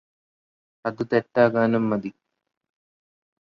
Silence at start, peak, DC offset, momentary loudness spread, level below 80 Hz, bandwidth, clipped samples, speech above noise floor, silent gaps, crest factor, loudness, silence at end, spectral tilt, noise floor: 0.85 s; -6 dBFS; under 0.1%; 13 LU; -66 dBFS; 6.2 kHz; under 0.1%; over 68 dB; none; 20 dB; -23 LUFS; 1.3 s; -8.5 dB/octave; under -90 dBFS